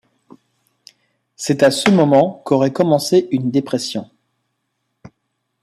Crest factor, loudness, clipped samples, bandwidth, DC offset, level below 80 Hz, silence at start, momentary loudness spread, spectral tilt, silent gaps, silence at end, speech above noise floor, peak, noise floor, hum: 16 dB; -16 LUFS; under 0.1%; 15 kHz; under 0.1%; -60 dBFS; 1.4 s; 10 LU; -5.5 dB/octave; none; 0.55 s; 57 dB; -2 dBFS; -72 dBFS; none